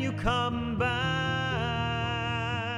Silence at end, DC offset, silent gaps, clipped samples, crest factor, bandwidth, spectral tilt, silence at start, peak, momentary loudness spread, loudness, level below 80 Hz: 0 s; under 0.1%; none; under 0.1%; 16 dB; 11 kHz; -5.5 dB/octave; 0 s; -12 dBFS; 2 LU; -29 LUFS; -44 dBFS